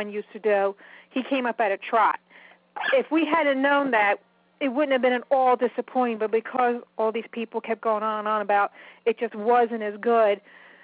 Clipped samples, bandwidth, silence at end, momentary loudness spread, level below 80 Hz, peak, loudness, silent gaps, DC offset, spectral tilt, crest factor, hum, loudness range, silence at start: under 0.1%; 4 kHz; 0.45 s; 9 LU; -78 dBFS; -8 dBFS; -24 LUFS; none; under 0.1%; -8 dB/octave; 16 dB; none; 3 LU; 0 s